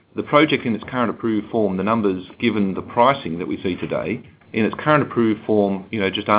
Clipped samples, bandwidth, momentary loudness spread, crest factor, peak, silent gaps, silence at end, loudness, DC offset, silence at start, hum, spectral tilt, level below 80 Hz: under 0.1%; 4 kHz; 8 LU; 20 dB; 0 dBFS; none; 0 s; -20 LUFS; under 0.1%; 0.15 s; none; -10 dB/octave; -52 dBFS